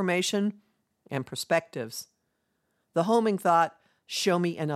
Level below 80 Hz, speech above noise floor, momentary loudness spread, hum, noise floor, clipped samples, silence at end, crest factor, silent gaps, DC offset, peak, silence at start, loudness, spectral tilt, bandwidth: -80 dBFS; 50 dB; 13 LU; none; -77 dBFS; under 0.1%; 0 s; 18 dB; none; under 0.1%; -10 dBFS; 0 s; -28 LUFS; -4.5 dB/octave; 16 kHz